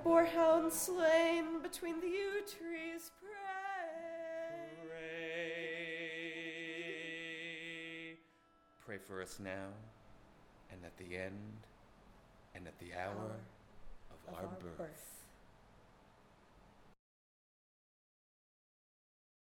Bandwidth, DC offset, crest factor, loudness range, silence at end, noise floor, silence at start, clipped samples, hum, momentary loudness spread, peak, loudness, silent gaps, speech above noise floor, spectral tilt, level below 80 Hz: 17.5 kHz; under 0.1%; 22 dB; 16 LU; 2.6 s; -70 dBFS; 0 s; under 0.1%; none; 23 LU; -18 dBFS; -40 LUFS; none; 31 dB; -4 dB/octave; -70 dBFS